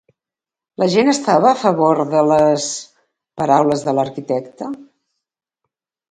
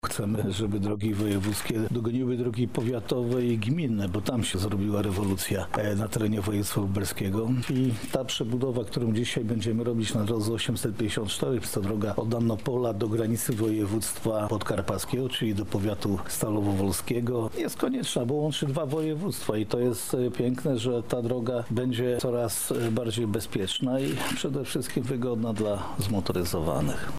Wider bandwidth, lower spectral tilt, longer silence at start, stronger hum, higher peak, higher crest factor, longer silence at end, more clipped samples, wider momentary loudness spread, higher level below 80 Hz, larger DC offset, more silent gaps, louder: second, 9.6 kHz vs 16 kHz; about the same, -5 dB/octave vs -5.5 dB/octave; first, 0.8 s vs 0 s; neither; first, 0 dBFS vs -10 dBFS; about the same, 18 dB vs 18 dB; first, 1.3 s vs 0 s; neither; first, 15 LU vs 2 LU; second, -60 dBFS vs -52 dBFS; second, under 0.1% vs 0.8%; neither; first, -16 LUFS vs -28 LUFS